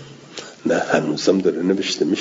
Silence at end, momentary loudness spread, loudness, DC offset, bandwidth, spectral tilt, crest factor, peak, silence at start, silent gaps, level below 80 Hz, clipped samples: 0 s; 17 LU; -19 LUFS; under 0.1%; 7.8 kHz; -4.5 dB/octave; 18 dB; -2 dBFS; 0 s; none; -64 dBFS; under 0.1%